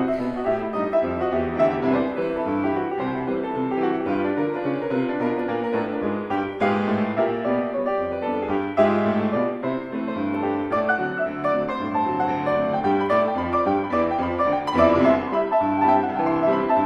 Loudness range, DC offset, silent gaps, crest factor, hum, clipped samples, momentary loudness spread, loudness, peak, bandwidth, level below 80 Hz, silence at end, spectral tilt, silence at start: 4 LU; under 0.1%; none; 18 dB; none; under 0.1%; 6 LU; -23 LUFS; -4 dBFS; 8.6 kHz; -54 dBFS; 0 s; -8 dB/octave; 0 s